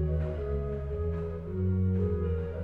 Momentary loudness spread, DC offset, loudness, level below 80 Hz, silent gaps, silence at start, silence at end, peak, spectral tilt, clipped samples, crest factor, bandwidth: 6 LU; under 0.1%; -32 LUFS; -38 dBFS; none; 0 s; 0 s; -18 dBFS; -11.5 dB/octave; under 0.1%; 12 dB; 3.5 kHz